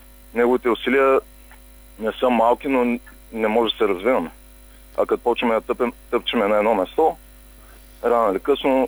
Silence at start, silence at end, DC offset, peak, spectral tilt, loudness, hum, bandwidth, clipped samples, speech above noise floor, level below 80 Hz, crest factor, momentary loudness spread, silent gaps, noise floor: 0.35 s; 0 s; under 0.1%; -6 dBFS; -5 dB/octave; -20 LUFS; none; over 20 kHz; under 0.1%; 26 dB; -46 dBFS; 16 dB; 10 LU; none; -45 dBFS